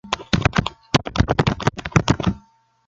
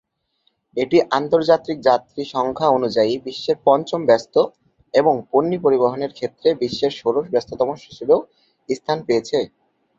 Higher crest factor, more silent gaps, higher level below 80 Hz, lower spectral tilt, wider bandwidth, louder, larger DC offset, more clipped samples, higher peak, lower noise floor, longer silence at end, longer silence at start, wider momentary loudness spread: about the same, 20 dB vs 18 dB; neither; first, -34 dBFS vs -60 dBFS; about the same, -5.5 dB/octave vs -6 dB/octave; first, 8.4 kHz vs 7.6 kHz; about the same, -21 LUFS vs -19 LUFS; neither; neither; about the same, 0 dBFS vs -2 dBFS; second, -54 dBFS vs -67 dBFS; about the same, 0.5 s vs 0.5 s; second, 0.05 s vs 0.75 s; second, 5 LU vs 8 LU